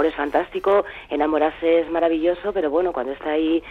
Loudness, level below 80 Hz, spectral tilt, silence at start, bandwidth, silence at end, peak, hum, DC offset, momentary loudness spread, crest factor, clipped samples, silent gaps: -21 LUFS; -50 dBFS; -6.5 dB/octave; 0 s; 4.8 kHz; 0 s; -6 dBFS; none; under 0.1%; 5 LU; 14 dB; under 0.1%; none